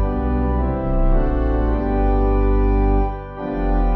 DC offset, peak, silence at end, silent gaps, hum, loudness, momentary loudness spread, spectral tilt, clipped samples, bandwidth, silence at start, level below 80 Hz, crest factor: under 0.1%; -6 dBFS; 0 s; none; 50 Hz at -25 dBFS; -20 LUFS; 5 LU; -11.5 dB/octave; under 0.1%; 4.1 kHz; 0 s; -18 dBFS; 12 dB